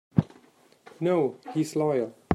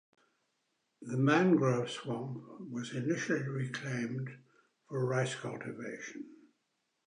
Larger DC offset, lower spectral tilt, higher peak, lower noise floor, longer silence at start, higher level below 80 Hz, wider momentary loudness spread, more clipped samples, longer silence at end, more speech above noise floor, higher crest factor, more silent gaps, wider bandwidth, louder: neither; first, -7.5 dB/octave vs -6 dB/octave; first, -6 dBFS vs -16 dBFS; second, -59 dBFS vs -81 dBFS; second, 0.15 s vs 1 s; first, -56 dBFS vs -80 dBFS; second, 6 LU vs 17 LU; neither; second, 0 s vs 0.75 s; second, 32 dB vs 48 dB; about the same, 22 dB vs 20 dB; neither; first, 14 kHz vs 10.5 kHz; first, -27 LUFS vs -34 LUFS